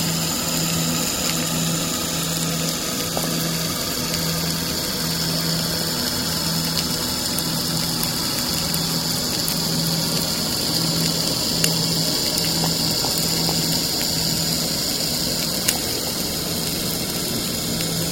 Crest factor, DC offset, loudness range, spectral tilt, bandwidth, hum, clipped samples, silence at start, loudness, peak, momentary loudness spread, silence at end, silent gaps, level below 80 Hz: 22 dB; under 0.1%; 3 LU; -2.5 dB/octave; 17 kHz; none; under 0.1%; 0 s; -20 LUFS; 0 dBFS; 3 LU; 0 s; none; -44 dBFS